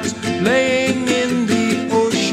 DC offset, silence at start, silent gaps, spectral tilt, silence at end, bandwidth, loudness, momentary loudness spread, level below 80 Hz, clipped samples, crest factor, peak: under 0.1%; 0 s; none; -4 dB/octave; 0 s; 15 kHz; -17 LUFS; 3 LU; -52 dBFS; under 0.1%; 14 dB; -4 dBFS